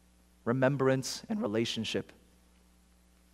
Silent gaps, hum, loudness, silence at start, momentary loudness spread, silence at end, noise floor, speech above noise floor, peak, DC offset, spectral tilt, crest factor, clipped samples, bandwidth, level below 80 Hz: none; none; -32 LUFS; 0.45 s; 10 LU; 1.3 s; -64 dBFS; 33 dB; -12 dBFS; under 0.1%; -5 dB/octave; 22 dB; under 0.1%; 15 kHz; -66 dBFS